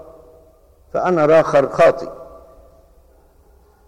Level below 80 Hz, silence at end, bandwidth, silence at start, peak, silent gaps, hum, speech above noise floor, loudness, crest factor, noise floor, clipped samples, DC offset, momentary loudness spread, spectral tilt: -50 dBFS; 1.6 s; 11.5 kHz; 0.95 s; -4 dBFS; none; none; 37 dB; -15 LUFS; 16 dB; -51 dBFS; under 0.1%; under 0.1%; 18 LU; -6.5 dB/octave